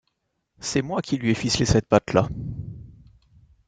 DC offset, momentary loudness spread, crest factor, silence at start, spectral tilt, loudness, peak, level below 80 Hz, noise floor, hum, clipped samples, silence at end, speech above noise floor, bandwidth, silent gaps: under 0.1%; 16 LU; 22 dB; 0.6 s; -5 dB/octave; -23 LUFS; -2 dBFS; -44 dBFS; -75 dBFS; none; under 0.1%; 0.75 s; 53 dB; 9.4 kHz; none